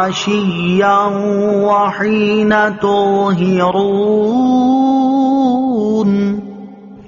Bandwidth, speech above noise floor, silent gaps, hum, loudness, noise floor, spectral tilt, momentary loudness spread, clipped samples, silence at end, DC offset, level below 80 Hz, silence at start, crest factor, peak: 7.2 kHz; 20 dB; none; none; -13 LUFS; -33 dBFS; -5 dB/octave; 3 LU; under 0.1%; 0.05 s; under 0.1%; -50 dBFS; 0 s; 12 dB; -2 dBFS